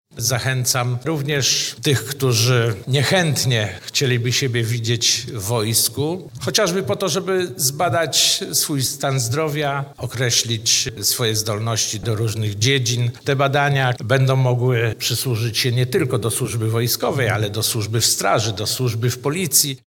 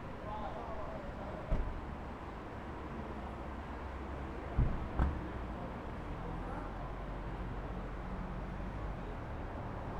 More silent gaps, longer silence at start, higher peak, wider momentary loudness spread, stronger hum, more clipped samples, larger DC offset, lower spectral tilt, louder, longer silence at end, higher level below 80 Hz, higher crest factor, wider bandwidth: neither; first, 0.15 s vs 0 s; first, -2 dBFS vs -18 dBFS; second, 5 LU vs 8 LU; neither; neither; neither; second, -3.5 dB/octave vs -8 dB/octave; first, -19 LUFS vs -43 LUFS; about the same, 0.1 s vs 0 s; second, -54 dBFS vs -44 dBFS; about the same, 18 dB vs 22 dB; first, 18 kHz vs 9 kHz